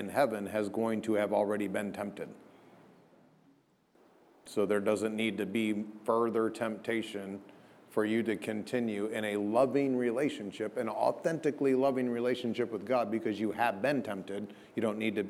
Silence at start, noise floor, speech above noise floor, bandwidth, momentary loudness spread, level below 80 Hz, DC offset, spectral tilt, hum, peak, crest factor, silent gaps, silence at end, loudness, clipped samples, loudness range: 0 s; -67 dBFS; 35 dB; 15.5 kHz; 10 LU; -80 dBFS; under 0.1%; -6 dB/octave; none; -14 dBFS; 20 dB; none; 0 s; -32 LUFS; under 0.1%; 5 LU